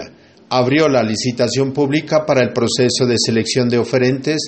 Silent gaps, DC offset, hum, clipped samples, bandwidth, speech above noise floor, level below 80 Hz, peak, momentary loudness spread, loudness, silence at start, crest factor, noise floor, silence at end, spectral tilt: none; under 0.1%; none; under 0.1%; 8.8 kHz; 23 dB; -54 dBFS; -2 dBFS; 4 LU; -16 LUFS; 0 s; 14 dB; -38 dBFS; 0 s; -4.5 dB/octave